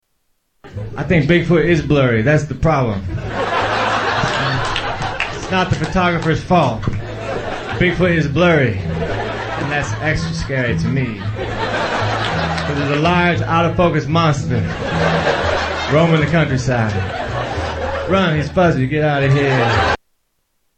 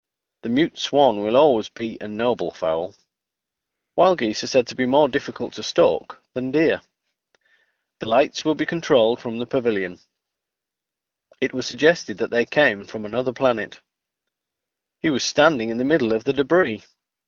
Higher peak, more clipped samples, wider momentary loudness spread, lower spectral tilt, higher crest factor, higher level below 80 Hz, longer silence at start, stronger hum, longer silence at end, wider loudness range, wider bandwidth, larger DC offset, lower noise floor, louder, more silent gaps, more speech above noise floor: about the same, -2 dBFS vs 0 dBFS; neither; second, 8 LU vs 11 LU; first, -6.5 dB/octave vs -4.5 dB/octave; second, 16 dB vs 22 dB; first, -34 dBFS vs -60 dBFS; first, 0.65 s vs 0.45 s; neither; first, 0.8 s vs 0.5 s; about the same, 3 LU vs 3 LU; first, 8.8 kHz vs 7.4 kHz; neither; second, -66 dBFS vs -86 dBFS; first, -17 LUFS vs -21 LUFS; neither; second, 51 dB vs 65 dB